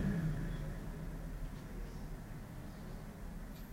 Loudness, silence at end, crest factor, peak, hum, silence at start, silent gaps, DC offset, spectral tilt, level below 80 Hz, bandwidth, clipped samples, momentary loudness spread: -46 LUFS; 0 s; 16 dB; -26 dBFS; none; 0 s; none; under 0.1%; -7 dB/octave; -46 dBFS; 16 kHz; under 0.1%; 10 LU